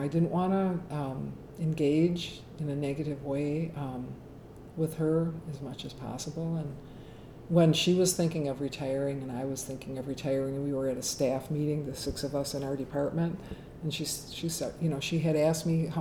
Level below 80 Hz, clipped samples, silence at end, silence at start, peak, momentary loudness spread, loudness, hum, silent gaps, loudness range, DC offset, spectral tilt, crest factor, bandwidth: -54 dBFS; under 0.1%; 0 s; 0 s; -12 dBFS; 14 LU; -31 LUFS; none; none; 5 LU; under 0.1%; -5.5 dB/octave; 18 dB; 18.5 kHz